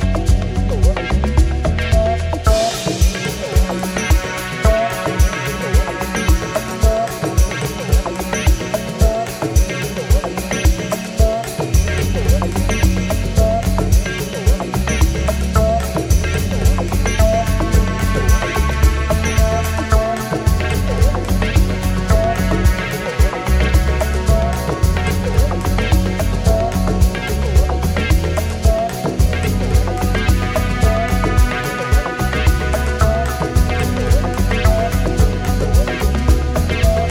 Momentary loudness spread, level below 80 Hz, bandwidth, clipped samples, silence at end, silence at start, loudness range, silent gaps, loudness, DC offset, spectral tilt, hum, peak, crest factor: 3 LU; -18 dBFS; 17 kHz; under 0.1%; 0 s; 0 s; 1 LU; none; -17 LUFS; under 0.1%; -5.5 dB/octave; none; -2 dBFS; 14 dB